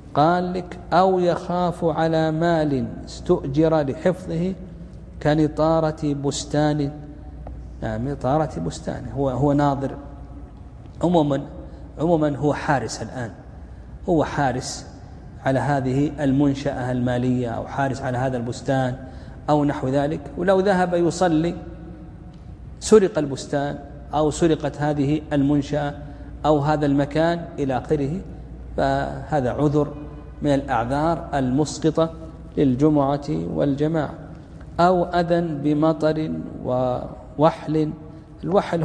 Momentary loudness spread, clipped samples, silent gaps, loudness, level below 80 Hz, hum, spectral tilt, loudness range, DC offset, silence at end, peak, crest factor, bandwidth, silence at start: 19 LU; under 0.1%; none; -22 LUFS; -40 dBFS; none; -7 dB/octave; 3 LU; under 0.1%; 0 s; -2 dBFS; 20 dB; 11 kHz; 0 s